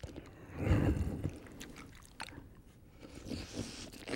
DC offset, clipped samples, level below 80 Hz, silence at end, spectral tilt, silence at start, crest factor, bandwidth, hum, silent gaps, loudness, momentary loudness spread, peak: under 0.1%; under 0.1%; -46 dBFS; 0 s; -6 dB/octave; 0 s; 22 dB; 16.5 kHz; none; none; -39 LUFS; 23 LU; -18 dBFS